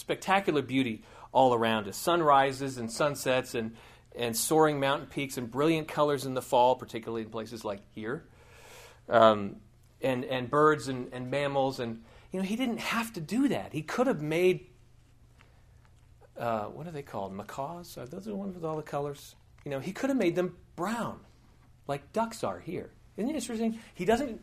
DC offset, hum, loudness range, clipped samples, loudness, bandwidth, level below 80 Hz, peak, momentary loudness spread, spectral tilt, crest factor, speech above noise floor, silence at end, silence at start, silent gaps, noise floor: under 0.1%; none; 9 LU; under 0.1%; -30 LUFS; 15.5 kHz; -62 dBFS; -6 dBFS; 15 LU; -5 dB/octave; 24 dB; 29 dB; 0 s; 0 s; none; -59 dBFS